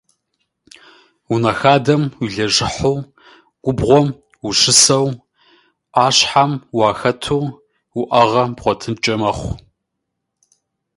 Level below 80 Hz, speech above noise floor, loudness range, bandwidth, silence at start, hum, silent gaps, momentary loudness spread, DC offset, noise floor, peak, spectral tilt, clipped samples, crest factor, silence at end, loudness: -44 dBFS; 61 dB; 5 LU; 16 kHz; 1.3 s; none; none; 14 LU; under 0.1%; -76 dBFS; 0 dBFS; -3.5 dB/octave; under 0.1%; 18 dB; 1.4 s; -15 LUFS